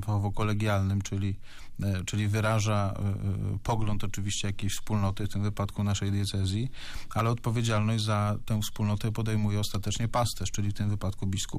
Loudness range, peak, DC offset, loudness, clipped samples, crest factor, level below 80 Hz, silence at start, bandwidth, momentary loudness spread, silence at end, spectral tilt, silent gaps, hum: 2 LU; -18 dBFS; under 0.1%; -30 LUFS; under 0.1%; 10 dB; -42 dBFS; 0 s; 15.5 kHz; 5 LU; 0 s; -5.5 dB/octave; none; none